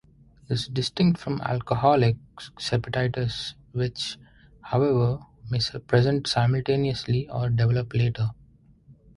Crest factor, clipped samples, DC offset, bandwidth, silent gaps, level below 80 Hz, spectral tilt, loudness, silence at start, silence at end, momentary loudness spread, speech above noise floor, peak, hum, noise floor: 18 dB; under 0.1%; under 0.1%; 11 kHz; none; -50 dBFS; -6.5 dB/octave; -25 LUFS; 0.5 s; 0.25 s; 10 LU; 31 dB; -6 dBFS; none; -55 dBFS